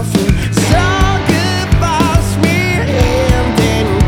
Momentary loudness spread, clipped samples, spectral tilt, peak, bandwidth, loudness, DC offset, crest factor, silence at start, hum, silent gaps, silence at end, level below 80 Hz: 2 LU; under 0.1%; -5.5 dB/octave; 0 dBFS; 17 kHz; -12 LUFS; under 0.1%; 12 dB; 0 s; none; none; 0 s; -20 dBFS